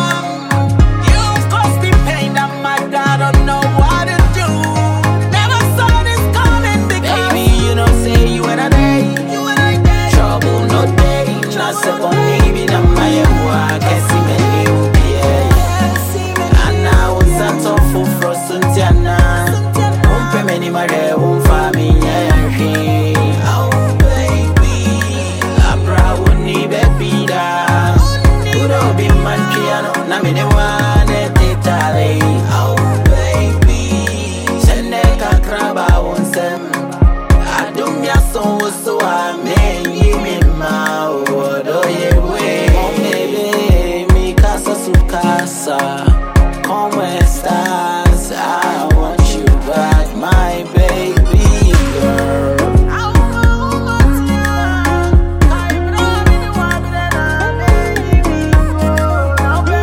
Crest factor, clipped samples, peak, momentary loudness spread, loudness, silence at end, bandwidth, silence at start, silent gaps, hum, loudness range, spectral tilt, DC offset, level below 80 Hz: 10 dB; under 0.1%; 0 dBFS; 4 LU; -13 LUFS; 0 s; 17 kHz; 0 s; none; none; 2 LU; -5.5 dB/octave; under 0.1%; -16 dBFS